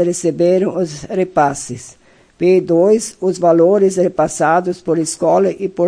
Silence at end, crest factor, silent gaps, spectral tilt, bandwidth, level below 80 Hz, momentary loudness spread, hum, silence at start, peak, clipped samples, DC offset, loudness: 0 s; 14 dB; none; -5.5 dB/octave; 10.5 kHz; -52 dBFS; 8 LU; none; 0 s; 0 dBFS; under 0.1%; under 0.1%; -15 LUFS